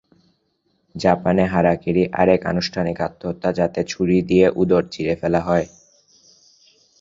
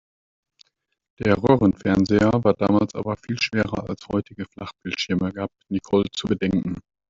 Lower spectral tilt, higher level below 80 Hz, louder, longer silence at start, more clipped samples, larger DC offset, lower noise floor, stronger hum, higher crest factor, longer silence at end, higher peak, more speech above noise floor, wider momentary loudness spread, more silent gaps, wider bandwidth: about the same, -7 dB/octave vs -6.5 dB/octave; about the same, -46 dBFS vs -50 dBFS; first, -19 LUFS vs -22 LUFS; second, 0.95 s vs 1.2 s; neither; neither; first, -67 dBFS vs -60 dBFS; neither; about the same, 18 dB vs 20 dB; first, 1.35 s vs 0.3 s; about the same, -2 dBFS vs -2 dBFS; first, 49 dB vs 38 dB; second, 8 LU vs 12 LU; neither; about the same, 7.6 kHz vs 7.6 kHz